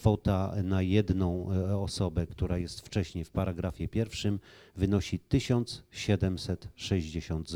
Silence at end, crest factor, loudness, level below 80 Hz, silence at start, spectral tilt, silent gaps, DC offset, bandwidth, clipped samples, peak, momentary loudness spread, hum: 0 s; 20 dB; -31 LUFS; -44 dBFS; 0 s; -6.5 dB/octave; none; under 0.1%; 12.5 kHz; under 0.1%; -10 dBFS; 8 LU; none